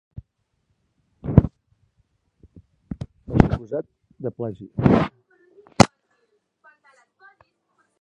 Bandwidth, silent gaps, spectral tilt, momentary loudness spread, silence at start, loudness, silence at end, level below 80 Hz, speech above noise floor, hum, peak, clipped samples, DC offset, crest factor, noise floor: 11.5 kHz; none; -6.5 dB/octave; 22 LU; 0.15 s; -21 LUFS; 2.15 s; -38 dBFS; 49 dB; none; 0 dBFS; under 0.1%; under 0.1%; 24 dB; -72 dBFS